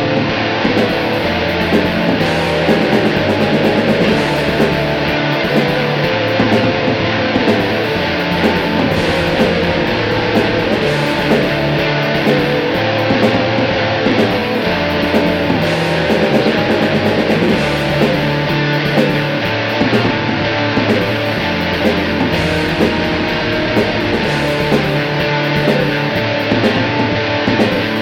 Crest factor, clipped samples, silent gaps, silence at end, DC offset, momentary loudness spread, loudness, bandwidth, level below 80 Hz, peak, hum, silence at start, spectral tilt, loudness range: 14 dB; under 0.1%; none; 0 s; under 0.1%; 2 LU; -14 LUFS; 17 kHz; -36 dBFS; 0 dBFS; none; 0 s; -6 dB/octave; 1 LU